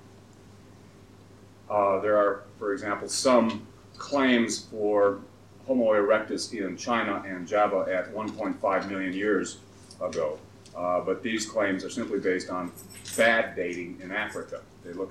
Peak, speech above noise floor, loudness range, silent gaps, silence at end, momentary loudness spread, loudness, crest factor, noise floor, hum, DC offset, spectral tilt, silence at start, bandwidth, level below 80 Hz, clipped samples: -8 dBFS; 24 dB; 4 LU; none; 0 s; 15 LU; -27 LUFS; 20 dB; -52 dBFS; none; under 0.1%; -4 dB/octave; 0.05 s; 14.5 kHz; -66 dBFS; under 0.1%